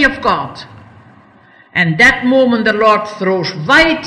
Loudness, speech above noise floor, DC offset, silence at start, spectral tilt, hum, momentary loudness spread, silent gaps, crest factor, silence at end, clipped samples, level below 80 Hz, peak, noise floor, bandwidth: -12 LUFS; 33 dB; under 0.1%; 0 s; -5 dB/octave; none; 11 LU; none; 14 dB; 0 s; under 0.1%; -40 dBFS; 0 dBFS; -45 dBFS; 13 kHz